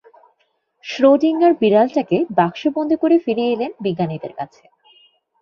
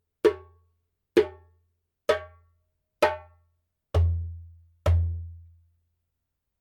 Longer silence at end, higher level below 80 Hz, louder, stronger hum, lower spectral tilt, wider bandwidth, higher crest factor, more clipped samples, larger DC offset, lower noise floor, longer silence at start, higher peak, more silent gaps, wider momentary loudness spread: second, 0.95 s vs 1.2 s; second, -64 dBFS vs -38 dBFS; first, -17 LUFS vs -27 LUFS; neither; about the same, -7.5 dB/octave vs -7 dB/octave; second, 6.8 kHz vs 13.5 kHz; second, 16 dB vs 22 dB; neither; neither; second, -66 dBFS vs -82 dBFS; first, 0.85 s vs 0.25 s; first, -2 dBFS vs -6 dBFS; neither; about the same, 16 LU vs 16 LU